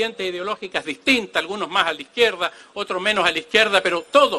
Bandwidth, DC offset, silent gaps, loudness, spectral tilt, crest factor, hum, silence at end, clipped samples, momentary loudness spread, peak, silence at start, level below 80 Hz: 13 kHz; under 0.1%; none; -20 LUFS; -2.5 dB/octave; 20 dB; none; 0 s; under 0.1%; 10 LU; -2 dBFS; 0 s; -58 dBFS